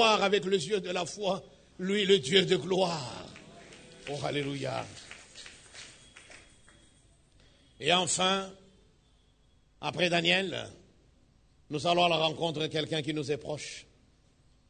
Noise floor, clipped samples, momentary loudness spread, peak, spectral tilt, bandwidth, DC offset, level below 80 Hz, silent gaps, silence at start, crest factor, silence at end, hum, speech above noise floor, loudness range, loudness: -65 dBFS; under 0.1%; 22 LU; -8 dBFS; -3.5 dB/octave; 9.6 kHz; under 0.1%; -64 dBFS; none; 0 s; 24 dB; 0.9 s; none; 35 dB; 10 LU; -29 LUFS